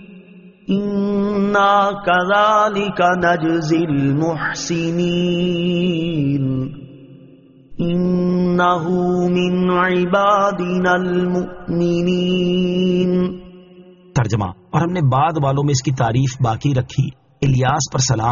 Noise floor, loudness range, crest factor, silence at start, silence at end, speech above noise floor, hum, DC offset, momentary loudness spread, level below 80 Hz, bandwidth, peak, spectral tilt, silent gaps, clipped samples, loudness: -45 dBFS; 4 LU; 14 dB; 0 s; 0 s; 29 dB; none; under 0.1%; 7 LU; -46 dBFS; 7.2 kHz; -2 dBFS; -5.5 dB/octave; none; under 0.1%; -17 LUFS